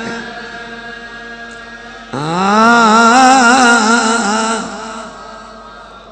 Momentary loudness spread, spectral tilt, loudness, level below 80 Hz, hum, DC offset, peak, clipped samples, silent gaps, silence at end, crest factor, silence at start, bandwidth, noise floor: 23 LU; -3 dB/octave; -9 LUFS; -48 dBFS; none; under 0.1%; 0 dBFS; 0.4%; none; 0 s; 14 dB; 0 s; 11 kHz; -34 dBFS